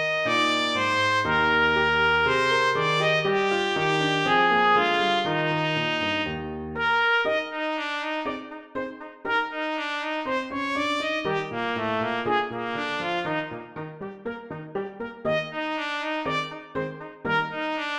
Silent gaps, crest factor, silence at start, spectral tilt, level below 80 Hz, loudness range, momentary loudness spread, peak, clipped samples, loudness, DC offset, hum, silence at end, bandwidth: none; 16 dB; 0 s; -4.5 dB/octave; -54 dBFS; 9 LU; 14 LU; -10 dBFS; under 0.1%; -24 LUFS; under 0.1%; none; 0 s; 13 kHz